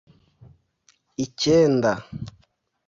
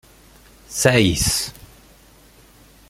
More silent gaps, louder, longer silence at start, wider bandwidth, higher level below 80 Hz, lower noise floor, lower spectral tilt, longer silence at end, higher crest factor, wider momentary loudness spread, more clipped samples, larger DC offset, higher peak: neither; second, -21 LUFS vs -18 LUFS; first, 1.2 s vs 0.7 s; second, 7.8 kHz vs 16.5 kHz; second, -54 dBFS vs -40 dBFS; first, -64 dBFS vs -50 dBFS; first, -5.5 dB/octave vs -3.5 dB/octave; second, 0.6 s vs 1.4 s; about the same, 18 dB vs 20 dB; first, 21 LU vs 15 LU; neither; neither; second, -8 dBFS vs -2 dBFS